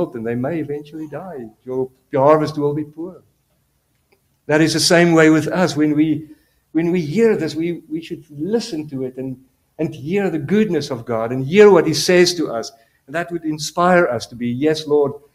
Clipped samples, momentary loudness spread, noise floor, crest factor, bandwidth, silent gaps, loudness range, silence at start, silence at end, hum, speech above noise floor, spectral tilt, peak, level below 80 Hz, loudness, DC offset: under 0.1%; 17 LU; -64 dBFS; 18 dB; 15 kHz; none; 6 LU; 0 s; 0.2 s; none; 47 dB; -5 dB/octave; 0 dBFS; -56 dBFS; -17 LUFS; under 0.1%